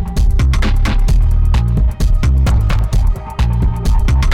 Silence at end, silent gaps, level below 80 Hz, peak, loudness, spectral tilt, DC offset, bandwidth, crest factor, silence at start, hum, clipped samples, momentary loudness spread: 0 s; none; -12 dBFS; -4 dBFS; -15 LUFS; -6.5 dB/octave; under 0.1%; 12.5 kHz; 6 dB; 0 s; none; under 0.1%; 3 LU